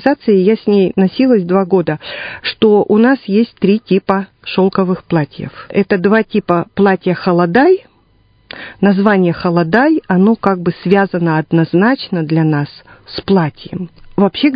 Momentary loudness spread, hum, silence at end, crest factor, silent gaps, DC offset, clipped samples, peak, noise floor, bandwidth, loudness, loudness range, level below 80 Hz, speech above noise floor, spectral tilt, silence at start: 10 LU; none; 0 s; 12 dB; none; under 0.1%; under 0.1%; 0 dBFS; -52 dBFS; 5.2 kHz; -13 LUFS; 2 LU; -50 dBFS; 39 dB; -10 dB/octave; 0 s